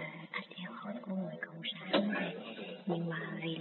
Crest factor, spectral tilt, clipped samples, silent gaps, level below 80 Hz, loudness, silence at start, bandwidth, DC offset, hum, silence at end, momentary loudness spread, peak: 24 dB; -4 dB/octave; under 0.1%; none; -90 dBFS; -38 LUFS; 0 s; 4.3 kHz; under 0.1%; none; 0 s; 11 LU; -16 dBFS